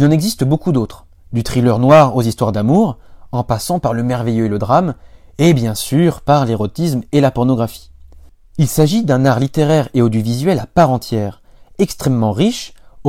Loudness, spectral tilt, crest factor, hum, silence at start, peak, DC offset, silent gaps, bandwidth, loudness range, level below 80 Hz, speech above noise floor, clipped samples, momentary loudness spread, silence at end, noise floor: -15 LUFS; -6.5 dB/octave; 14 dB; none; 0 s; 0 dBFS; under 0.1%; none; 16.5 kHz; 2 LU; -40 dBFS; 27 dB; under 0.1%; 9 LU; 0 s; -41 dBFS